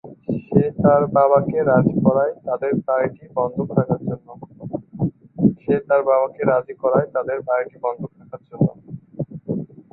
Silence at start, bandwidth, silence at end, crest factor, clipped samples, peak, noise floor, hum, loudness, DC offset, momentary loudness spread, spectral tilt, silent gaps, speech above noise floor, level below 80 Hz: 0.05 s; 4 kHz; 0.25 s; 18 dB; under 0.1%; -2 dBFS; -38 dBFS; none; -20 LUFS; under 0.1%; 15 LU; -14 dB/octave; none; 20 dB; -52 dBFS